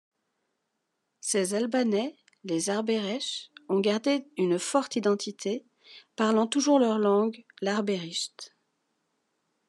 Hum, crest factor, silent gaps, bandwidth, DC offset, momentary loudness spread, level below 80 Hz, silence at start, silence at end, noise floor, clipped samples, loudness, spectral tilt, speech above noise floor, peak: none; 18 dB; none; 12.5 kHz; under 0.1%; 13 LU; -88 dBFS; 1.25 s; 1.2 s; -80 dBFS; under 0.1%; -28 LUFS; -4 dB/octave; 53 dB; -10 dBFS